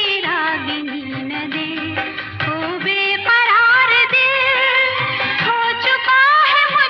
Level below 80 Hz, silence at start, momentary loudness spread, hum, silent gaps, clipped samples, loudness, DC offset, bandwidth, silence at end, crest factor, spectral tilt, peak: -60 dBFS; 0 s; 12 LU; none; none; under 0.1%; -14 LUFS; under 0.1%; 7.4 kHz; 0 s; 12 dB; -5 dB/octave; -4 dBFS